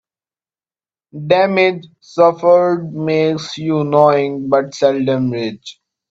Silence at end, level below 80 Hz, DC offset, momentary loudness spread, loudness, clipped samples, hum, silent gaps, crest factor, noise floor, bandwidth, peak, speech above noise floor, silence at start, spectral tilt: 0.4 s; -60 dBFS; under 0.1%; 14 LU; -15 LUFS; under 0.1%; none; none; 16 dB; under -90 dBFS; 7.8 kHz; 0 dBFS; over 75 dB; 1.15 s; -6.5 dB/octave